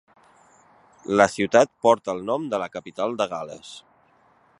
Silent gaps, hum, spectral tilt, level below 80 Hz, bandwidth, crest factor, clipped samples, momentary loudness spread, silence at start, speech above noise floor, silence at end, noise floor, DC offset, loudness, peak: none; none; -4.5 dB/octave; -64 dBFS; 11.5 kHz; 24 dB; under 0.1%; 21 LU; 1.1 s; 37 dB; 0.8 s; -59 dBFS; under 0.1%; -22 LUFS; 0 dBFS